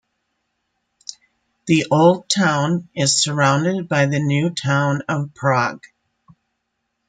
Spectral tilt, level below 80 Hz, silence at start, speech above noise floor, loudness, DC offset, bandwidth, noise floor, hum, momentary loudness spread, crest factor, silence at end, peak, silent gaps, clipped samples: -4.5 dB/octave; -62 dBFS; 1.1 s; 57 dB; -18 LUFS; under 0.1%; 9.6 kHz; -74 dBFS; none; 13 LU; 18 dB; 1.25 s; -2 dBFS; none; under 0.1%